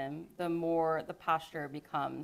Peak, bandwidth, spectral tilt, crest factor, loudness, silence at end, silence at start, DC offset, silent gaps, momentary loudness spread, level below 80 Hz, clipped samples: -18 dBFS; 15.5 kHz; -7 dB/octave; 18 dB; -35 LUFS; 0 s; 0 s; under 0.1%; none; 10 LU; -70 dBFS; under 0.1%